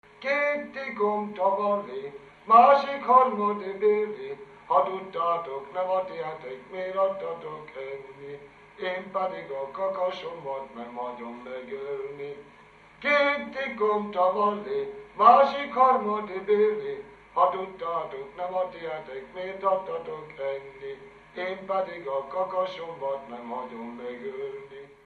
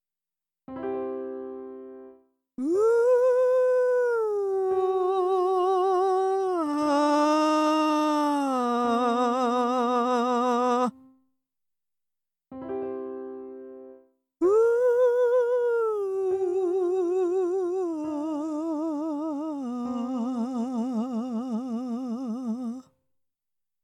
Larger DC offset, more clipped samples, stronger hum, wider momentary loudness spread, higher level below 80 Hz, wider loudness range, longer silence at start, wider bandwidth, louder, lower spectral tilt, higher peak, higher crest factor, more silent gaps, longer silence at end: neither; neither; neither; first, 18 LU vs 14 LU; first, -68 dBFS vs -74 dBFS; first, 10 LU vs 7 LU; second, 0.2 s vs 0.7 s; second, 6.8 kHz vs 12 kHz; about the same, -26 LUFS vs -25 LUFS; about the same, -6 dB/octave vs -5 dB/octave; first, -4 dBFS vs -14 dBFS; first, 24 dB vs 12 dB; neither; second, 0.1 s vs 1.05 s